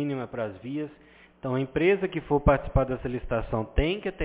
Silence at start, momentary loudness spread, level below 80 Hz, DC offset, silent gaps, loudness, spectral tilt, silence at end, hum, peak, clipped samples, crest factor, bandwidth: 0 s; 11 LU; -36 dBFS; under 0.1%; none; -27 LUFS; -11 dB/octave; 0 s; none; -6 dBFS; under 0.1%; 20 dB; 4 kHz